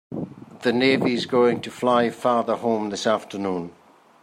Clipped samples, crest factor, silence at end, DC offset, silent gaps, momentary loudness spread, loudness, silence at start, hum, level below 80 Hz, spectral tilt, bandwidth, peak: under 0.1%; 18 dB; 0.5 s; under 0.1%; none; 13 LU; -22 LUFS; 0.1 s; none; -66 dBFS; -5 dB/octave; 14 kHz; -6 dBFS